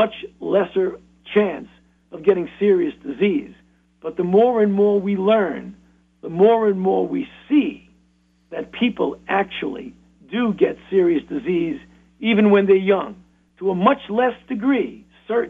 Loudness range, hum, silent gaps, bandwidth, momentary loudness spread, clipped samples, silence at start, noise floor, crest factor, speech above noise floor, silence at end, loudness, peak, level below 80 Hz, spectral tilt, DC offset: 4 LU; none; none; 3.8 kHz; 16 LU; under 0.1%; 0 s; -60 dBFS; 18 dB; 41 dB; 0 s; -20 LUFS; -2 dBFS; -58 dBFS; -8.5 dB/octave; under 0.1%